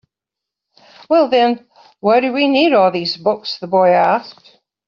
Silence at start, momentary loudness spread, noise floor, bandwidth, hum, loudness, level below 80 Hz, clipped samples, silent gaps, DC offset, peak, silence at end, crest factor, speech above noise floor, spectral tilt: 1.1 s; 8 LU; -84 dBFS; 7 kHz; none; -15 LUFS; -64 dBFS; under 0.1%; none; under 0.1%; -2 dBFS; 0.55 s; 14 dB; 70 dB; -2.5 dB/octave